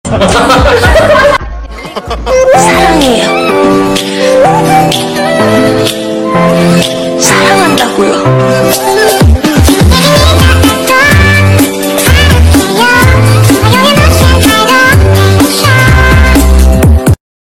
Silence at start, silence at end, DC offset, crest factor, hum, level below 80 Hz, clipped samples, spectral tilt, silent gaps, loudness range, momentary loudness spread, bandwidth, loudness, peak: 0.05 s; 0.3 s; under 0.1%; 6 dB; none; -14 dBFS; 2%; -5 dB/octave; none; 3 LU; 5 LU; 17 kHz; -6 LUFS; 0 dBFS